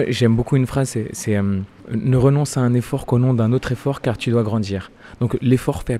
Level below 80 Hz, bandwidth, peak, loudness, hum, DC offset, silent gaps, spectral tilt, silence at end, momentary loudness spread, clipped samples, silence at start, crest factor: -42 dBFS; 13.5 kHz; -4 dBFS; -19 LUFS; none; under 0.1%; none; -7 dB/octave; 0 s; 8 LU; under 0.1%; 0 s; 14 dB